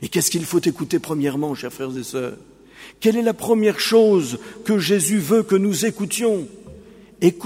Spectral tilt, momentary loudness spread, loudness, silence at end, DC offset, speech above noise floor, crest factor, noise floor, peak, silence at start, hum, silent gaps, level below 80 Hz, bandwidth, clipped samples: -4.5 dB/octave; 12 LU; -20 LUFS; 0 s; under 0.1%; 24 dB; 18 dB; -43 dBFS; -2 dBFS; 0 s; none; none; -58 dBFS; 16 kHz; under 0.1%